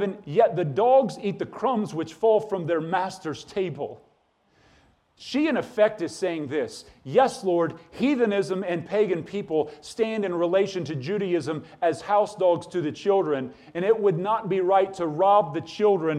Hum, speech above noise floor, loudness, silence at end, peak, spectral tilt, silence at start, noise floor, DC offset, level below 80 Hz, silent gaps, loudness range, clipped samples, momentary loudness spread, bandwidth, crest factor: none; 41 dB; -25 LUFS; 0 s; -6 dBFS; -6.5 dB/octave; 0 s; -65 dBFS; under 0.1%; -66 dBFS; none; 5 LU; under 0.1%; 9 LU; 11.5 kHz; 18 dB